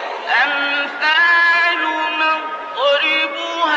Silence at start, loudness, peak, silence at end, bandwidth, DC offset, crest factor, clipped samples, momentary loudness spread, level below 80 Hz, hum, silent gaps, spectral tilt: 0 s; -15 LUFS; -4 dBFS; 0 s; 8.4 kHz; under 0.1%; 12 dB; under 0.1%; 8 LU; -78 dBFS; none; none; -0.5 dB/octave